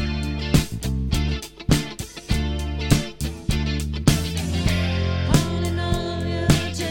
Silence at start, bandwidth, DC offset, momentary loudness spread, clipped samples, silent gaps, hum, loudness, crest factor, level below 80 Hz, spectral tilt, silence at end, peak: 0 s; 17.5 kHz; under 0.1%; 6 LU; under 0.1%; none; none; -23 LUFS; 22 dB; -28 dBFS; -5 dB/octave; 0 s; -2 dBFS